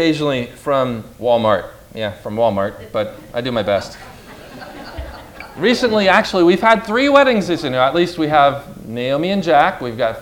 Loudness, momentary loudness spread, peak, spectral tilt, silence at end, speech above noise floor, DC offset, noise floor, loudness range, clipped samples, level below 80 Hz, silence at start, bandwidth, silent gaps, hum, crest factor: -16 LUFS; 20 LU; 0 dBFS; -5.5 dB/octave; 0 s; 21 dB; under 0.1%; -37 dBFS; 8 LU; under 0.1%; -44 dBFS; 0 s; 17.5 kHz; none; none; 16 dB